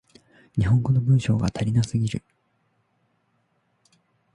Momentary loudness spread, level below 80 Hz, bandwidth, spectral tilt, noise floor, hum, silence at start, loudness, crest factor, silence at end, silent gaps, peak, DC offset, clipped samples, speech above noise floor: 9 LU; -46 dBFS; 10.5 kHz; -7.5 dB/octave; -69 dBFS; none; 0.55 s; -23 LUFS; 16 dB; 2.15 s; none; -10 dBFS; under 0.1%; under 0.1%; 48 dB